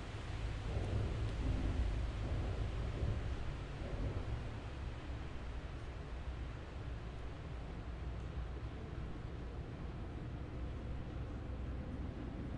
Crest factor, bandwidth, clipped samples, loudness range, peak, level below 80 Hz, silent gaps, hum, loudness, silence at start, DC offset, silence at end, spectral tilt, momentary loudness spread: 16 dB; 9.8 kHz; under 0.1%; 6 LU; -26 dBFS; -44 dBFS; none; none; -44 LUFS; 0 s; under 0.1%; 0 s; -7 dB/octave; 8 LU